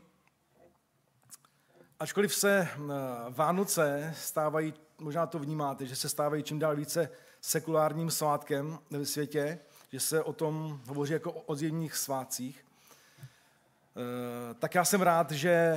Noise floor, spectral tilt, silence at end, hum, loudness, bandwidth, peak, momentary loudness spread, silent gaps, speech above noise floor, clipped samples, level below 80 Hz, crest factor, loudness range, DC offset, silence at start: -72 dBFS; -4 dB/octave; 0 s; none; -32 LUFS; 16 kHz; -12 dBFS; 11 LU; none; 40 dB; under 0.1%; -80 dBFS; 22 dB; 6 LU; under 0.1%; 1.3 s